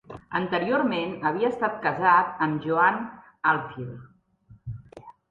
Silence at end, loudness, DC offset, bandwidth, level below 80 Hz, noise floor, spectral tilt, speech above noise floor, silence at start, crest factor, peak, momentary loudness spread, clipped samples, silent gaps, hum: 0.2 s; -24 LUFS; under 0.1%; 7.4 kHz; -60 dBFS; -55 dBFS; -8 dB/octave; 31 dB; 0.1 s; 20 dB; -6 dBFS; 20 LU; under 0.1%; none; none